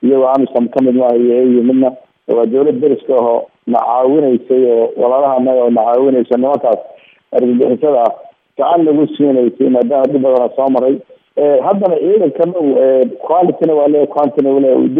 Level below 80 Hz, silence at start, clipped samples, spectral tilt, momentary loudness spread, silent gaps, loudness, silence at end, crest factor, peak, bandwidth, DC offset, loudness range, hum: -66 dBFS; 0 s; under 0.1%; -10 dB/octave; 5 LU; none; -12 LUFS; 0 s; 12 dB; 0 dBFS; 3.8 kHz; under 0.1%; 1 LU; none